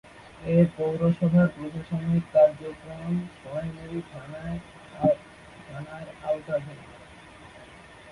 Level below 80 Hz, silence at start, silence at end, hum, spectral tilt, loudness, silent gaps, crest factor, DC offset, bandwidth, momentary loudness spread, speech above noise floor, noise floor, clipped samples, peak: -54 dBFS; 0.15 s; 0 s; none; -9 dB/octave; -26 LUFS; none; 18 dB; under 0.1%; 11 kHz; 25 LU; 22 dB; -48 dBFS; under 0.1%; -8 dBFS